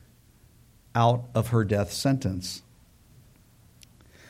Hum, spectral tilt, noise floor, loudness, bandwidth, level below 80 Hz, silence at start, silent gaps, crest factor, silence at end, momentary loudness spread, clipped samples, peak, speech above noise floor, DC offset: none; -6 dB/octave; -57 dBFS; -26 LUFS; 16 kHz; -54 dBFS; 0.95 s; none; 22 dB; 1.7 s; 11 LU; under 0.1%; -8 dBFS; 32 dB; under 0.1%